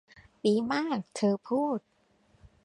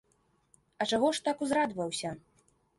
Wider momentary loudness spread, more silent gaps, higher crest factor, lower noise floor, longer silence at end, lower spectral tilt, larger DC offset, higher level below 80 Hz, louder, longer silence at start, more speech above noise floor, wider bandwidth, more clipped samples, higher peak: second, 5 LU vs 10 LU; neither; about the same, 18 dB vs 18 dB; second, -67 dBFS vs -72 dBFS; first, 0.85 s vs 0.6 s; first, -6 dB/octave vs -3.5 dB/octave; neither; about the same, -68 dBFS vs -70 dBFS; about the same, -30 LUFS vs -31 LUFS; second, 0.45 s vs 0.8 s; about the same, 38 dB vs 41 dB; about the same, 11 kHz vs 11.5 kHz; neither; about the same, -14 dBFS vs -16 dBFS